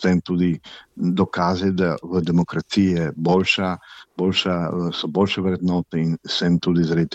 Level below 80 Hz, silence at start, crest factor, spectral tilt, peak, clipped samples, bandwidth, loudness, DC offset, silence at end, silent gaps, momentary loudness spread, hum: -52 dBFS; 0 s; 16 dB; -6.5 dB/octave; -6 dBFS; under 0.1%; 8.2 kHz; -21 LUFS; under 0.1%; 0 s; none; 5 LU; none